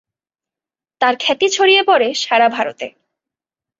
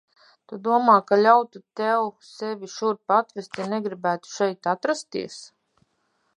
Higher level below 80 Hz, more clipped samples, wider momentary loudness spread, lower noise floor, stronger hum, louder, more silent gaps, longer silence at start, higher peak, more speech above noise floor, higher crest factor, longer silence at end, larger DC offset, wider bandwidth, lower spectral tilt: first, -68 dBFS vs -78 dBFS; neither; second, 12 LU vs 16 LU; first, -90 dBFS vs -71 dBFS; neither; first, -14 LUFS vs -23 LUFS; neither; first, 1 s vs 0.5 s; about the same, -2 dBFS vs -4 dBFS; first, 75 dB vs 48 dB; about the same, 16 dB vs 20 dB; about the same, 0.9 s vs 0.9 s; neither; second, 7.8 kHz vs 11 kHz; second, -1 dB/octave vs -4.5 dB/octave